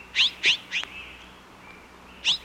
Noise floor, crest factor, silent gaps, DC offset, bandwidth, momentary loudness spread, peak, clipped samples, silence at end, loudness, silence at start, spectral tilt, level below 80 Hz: -48 dBFS; 18 dB; none; under 0.1%; 16.5 kHz; 26 LU; -10 dBFS; under 0.1%; 0 s; -23 LUFS; 0 s; 0.5 dB/octave; -58 dBFS